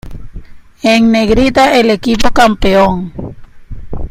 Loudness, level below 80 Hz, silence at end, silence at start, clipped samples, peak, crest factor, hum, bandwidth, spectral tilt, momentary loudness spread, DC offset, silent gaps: -10 LUFS; -26 dBFS; 0 s; 0.05 s; 0.1%; 0 dBFS; 10 dB; none; 15.5 kHz; -5 dB/octave; 19 LU; under 0.1%; none